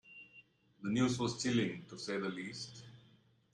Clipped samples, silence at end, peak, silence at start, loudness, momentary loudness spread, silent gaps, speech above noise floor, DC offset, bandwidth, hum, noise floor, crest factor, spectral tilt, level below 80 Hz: under 0.1%; 0.55 s; -20 dBFS; 0.05 s; -37 LUFS; 21 LU; none; 31 dB; under 0.1%; 11 kHz; none; -68 dBFS; 20 dB; -5 dB/octave; -72 dBFS